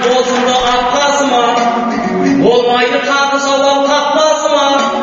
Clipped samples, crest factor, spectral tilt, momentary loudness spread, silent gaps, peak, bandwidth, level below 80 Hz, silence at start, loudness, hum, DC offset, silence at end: under 0.1%; 12 dB; -2 dB/octave; 3 LU; none; 0 dBFS; 8 kHz; -44 dBFS; 0 s; -11 LUFS; none; under 0.1%; 0 s